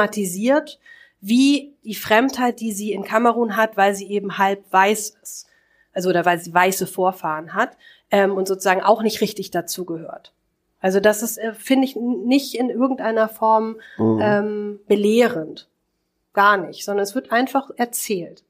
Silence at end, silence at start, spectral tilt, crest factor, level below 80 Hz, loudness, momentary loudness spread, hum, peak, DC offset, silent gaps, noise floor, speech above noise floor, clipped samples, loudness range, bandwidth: 0.2 s; 0 s; -4 dB/octave; 20 dB; -68 dBFS; -20 LUFS; 11 LU; none; 0 dBFS; under 0.1%; none; -72 dBFS; 53 dB; under 0.1%; 2 LU; 15.5 kHz